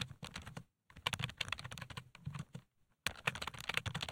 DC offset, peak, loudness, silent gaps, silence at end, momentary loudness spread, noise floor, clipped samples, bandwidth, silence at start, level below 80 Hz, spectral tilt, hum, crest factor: under 0.1%; -16 dBFS; -42 LUFS; none; 0 s; 14 LU; -63 dBFS; under 0.1%; 16.5 kHz; 0 s; -62 dBFS; -3 dB/octave; none; 30 dB